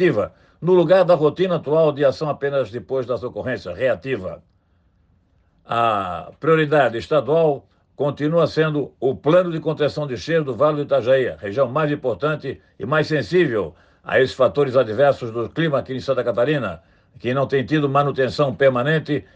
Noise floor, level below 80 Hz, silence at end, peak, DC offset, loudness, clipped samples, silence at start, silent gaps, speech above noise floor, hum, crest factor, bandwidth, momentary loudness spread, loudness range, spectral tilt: -60 dBFS; -58 dBFS; 0.15 s; -4 dBFS; under 0.1%; -20 LUFS; under 0.1%; 0 s; none; 41 dB; none; 16 dB; 8.4 kHz; 10 LU; 5 LU; -7.5 dB/octave